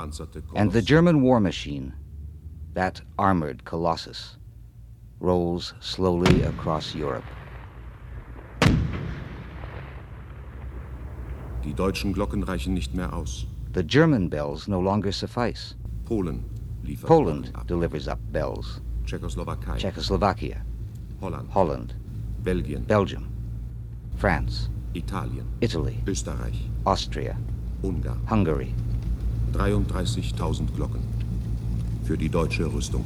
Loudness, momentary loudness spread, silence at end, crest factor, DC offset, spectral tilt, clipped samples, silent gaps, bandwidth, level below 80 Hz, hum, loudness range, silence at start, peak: -26 LUFS; 17 LU; 0 s; 22 dB; under 0.1%; -6.5 dB/octave; under 0.1%; none; 13.5 kHz; -34 dBFS; none; 4 LU; 0 s; -4 dBFS